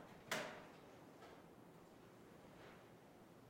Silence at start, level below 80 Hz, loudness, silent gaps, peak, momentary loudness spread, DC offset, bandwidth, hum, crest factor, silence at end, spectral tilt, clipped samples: 0 s; -82 dBFS; -55 LUFS; none; -28 dBFS; 17 LU; under 0.1%; 16 kHz; none; 28 dB; 0 s; -3 dB/octave; under 0.1%